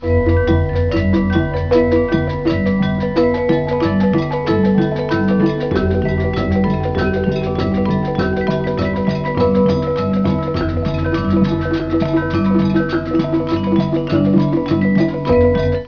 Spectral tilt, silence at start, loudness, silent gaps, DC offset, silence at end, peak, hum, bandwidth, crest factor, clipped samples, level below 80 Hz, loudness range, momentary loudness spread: -9 dB/octave; 0 s; -16 LUFS; none; 0.4%; 0 s; 0 dBFS; none; 5.4 kHz; 16 dB; under 0.1%; -30 dBFS; 1 LU; 4 LU